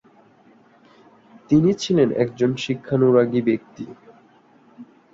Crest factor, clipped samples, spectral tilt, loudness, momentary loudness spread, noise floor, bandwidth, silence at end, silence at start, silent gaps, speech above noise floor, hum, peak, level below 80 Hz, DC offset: 18 dB; under 0.1%; -7 dB/octave; -20 LUFS; 14 LU; -54 dBFS; 7.6 kHz; 0.3 s; 1.5 s; none; 35 dB; none; -4 dBFS; -60 dBFS; under 0.1%